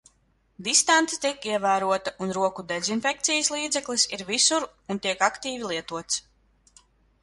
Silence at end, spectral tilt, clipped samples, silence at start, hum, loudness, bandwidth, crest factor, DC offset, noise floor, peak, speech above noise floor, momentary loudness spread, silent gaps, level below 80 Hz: 1 s; -1.5 dB/octave; under 0.1%; 0.6 s; none; -24 LUFS; 11.5 kHz; 20 dB; under 0.1%; -66 dBFS; -6 dBFS; 40 dB; 10 LU; none; -64 dBFS